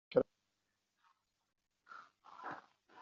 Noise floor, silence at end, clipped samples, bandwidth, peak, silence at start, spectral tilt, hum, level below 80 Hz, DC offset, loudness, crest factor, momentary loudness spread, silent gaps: -85 dBFS; 0 s; under 0.1%; 6.8 kHz; -16 dBFS; 0.1 s; -5 dB/octave; none; -76 dBFS; under 0.1%; -42 LUFS; 28 dB; 21 LU; none